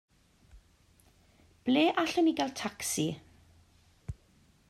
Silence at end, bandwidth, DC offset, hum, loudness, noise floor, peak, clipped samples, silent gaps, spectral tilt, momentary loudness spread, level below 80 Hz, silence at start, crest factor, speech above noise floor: 0.55 s; 14.5 kHz; under 0.1%; none; -30 LUFS; -64 dBFS; -14 dBFS; under 0.1%; none; -4 dB/octave; 20 LU; -60 dBFS; 0.55 s; 20 dB; 35 dB